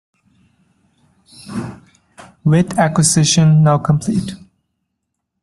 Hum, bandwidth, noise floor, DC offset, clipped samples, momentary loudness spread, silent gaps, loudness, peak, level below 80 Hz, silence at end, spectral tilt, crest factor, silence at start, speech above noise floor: none; 12.5 kHz; -75 dBFS; under 0.1%; under 0.1%; 17 LU; none; -14 LUFS; 0 dBFS; -50 dBFS; 1.05 s; -5 dB/octave; 16 dB; 1.45 s; 62 dB